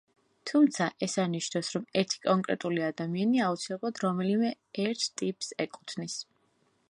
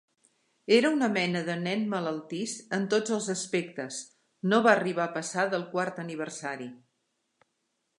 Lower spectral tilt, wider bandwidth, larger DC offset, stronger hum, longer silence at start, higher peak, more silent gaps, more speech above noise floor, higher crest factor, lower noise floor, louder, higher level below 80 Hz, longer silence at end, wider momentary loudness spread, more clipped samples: about the same, -4.5 dB/octave vs -4.5 dB/octave; about the same, 11.5 kHz vs 11.5 kHz; neither; neither; second, 0.45 s vs 0.7 s; second, -10 dBFS vs -6 dBFS; neither; second, 41 dB vs 50 dB; about the same, 20 dB vs 24 dB; second, -71 dBFS vs -78 dBFS; about the same, -30 LUFS vs -28 LUFS; about the same, -78 dBFS vs -82 dBFS; second, 0.7 s vs 1.2 s; second, 10 LU vs 13 LU; neither